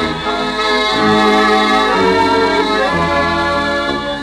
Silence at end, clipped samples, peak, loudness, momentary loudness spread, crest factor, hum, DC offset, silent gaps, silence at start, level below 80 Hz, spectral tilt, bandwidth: 0 s; under 0.1%; -2 dBFS; -13 LUFS; 6 LU; 12 dB; none; under 0.1%; none; 0 s; -38 dBFS; -4.5 dB/octave; 13.5 kHz